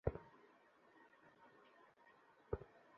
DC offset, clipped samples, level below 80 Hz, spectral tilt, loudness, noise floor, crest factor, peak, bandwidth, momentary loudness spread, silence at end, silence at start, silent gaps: under 0.1%; under 0.1%; -62 dBFS; -8 dB/octave; -51 LUFS; -71 dBFS; 30 dB; -24 dBFS; 6.6 kHz; 18 LU; 0 s; 0.05 s; none